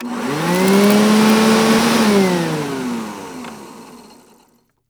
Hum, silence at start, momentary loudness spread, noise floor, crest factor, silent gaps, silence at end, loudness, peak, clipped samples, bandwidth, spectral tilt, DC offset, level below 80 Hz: none; 0 s; 19 LU; -57 dBFS; 16 dB; none; 0.95 s; -14 LUFS; 0 dBFS; under 0.1%; over 20 kHz; -5 dB/octave; under 0.1%; -54 dBFS